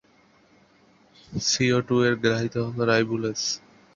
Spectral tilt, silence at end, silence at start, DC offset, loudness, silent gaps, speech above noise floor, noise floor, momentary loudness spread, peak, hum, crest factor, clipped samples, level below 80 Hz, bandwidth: -4 dB/octave; 0.35 s; 1.3 s; under 0.1%; -24 LUFS; none; 36 dB; -59 dBFS; 7 LU; -6 dBFS; none; 20 dB; under 0.1%; -58 dBFS; 7.6 kHz